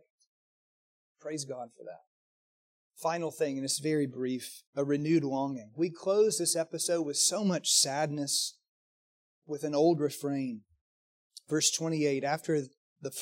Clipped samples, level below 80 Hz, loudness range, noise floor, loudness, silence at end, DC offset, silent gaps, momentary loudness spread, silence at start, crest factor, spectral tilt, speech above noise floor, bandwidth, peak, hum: under 0.1%; -82 dBFS; 7 LU; under -90 dBFS; -30 LUFS; 0 s; under 0.1%; 2.07-2.91 s, 4.67-4.73 s, 8.68-9.42 s, 10.81-11.30 s, 12.77-12.96 s; 14 LU; 1.25 s; 20 dB; -3.5 dB/octave; over 59 dB; 16.5 kHz; -12 dBFS; none